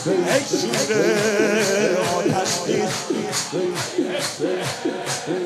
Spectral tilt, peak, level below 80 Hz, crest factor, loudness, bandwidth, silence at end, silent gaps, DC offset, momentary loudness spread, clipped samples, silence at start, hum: -3.5 dB/octave; -6 dBFS; -64 dBFS; 16 dB; -21 LUFS; 14.5 kHz; 0 s; none; under 0.1%; 6 LU; under 0.1%; 0 s; none